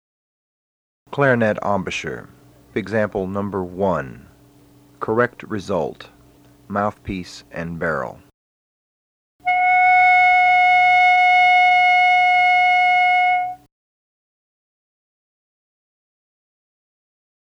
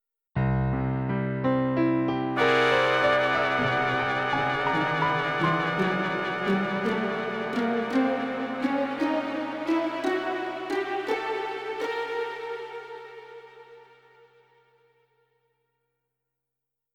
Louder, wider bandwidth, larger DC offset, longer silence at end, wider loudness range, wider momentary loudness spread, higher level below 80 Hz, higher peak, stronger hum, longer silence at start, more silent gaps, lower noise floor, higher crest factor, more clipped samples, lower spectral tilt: first, -16 LUFS vs -26 LUFS; second, 8.6 kHz vs 12 kHz; neither; first, 4.05 s vs 3.1 s; about the same, 14 LU vs 12 LU; first, 18 LU vs 10 LU; about the same, -54 dBFS vs -52 dBFS; first, -2 dBFS vs -8 dBFS; neither; first, 1.1 s vs 0.35 s; first, 8.34-9.39 s vs none; second, -50 dBFS vs -86 dBFS; about the same, 18 dB vs 20 dB; neither; second, -5 dB/octave vs -6.5 dB/octave